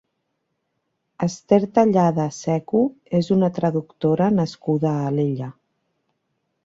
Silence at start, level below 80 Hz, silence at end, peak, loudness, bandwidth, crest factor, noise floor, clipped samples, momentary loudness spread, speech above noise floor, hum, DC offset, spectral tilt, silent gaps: 1.2 s; -60 dBFS; 1.15 s; -2 dBFS; -21 LUFS; 7.8 kHz; 18 dB; -75 dBFS; under 0.1%; 8 LU; 55 dB; none; under 0.1%; -8 dB/octave; none